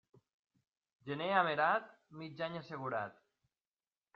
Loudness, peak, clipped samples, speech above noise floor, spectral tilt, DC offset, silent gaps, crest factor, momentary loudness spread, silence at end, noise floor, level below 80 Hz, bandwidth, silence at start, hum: -36 LUFS; -16 dBFS; under 0.1%; over 53 dB; -2.5 dB/octave; under 0.1%; none; 24 dB; 19 LU; 1.05 s; under -90 dBFS; -84 dBFS; 6.6 kHz; 1.05 s; none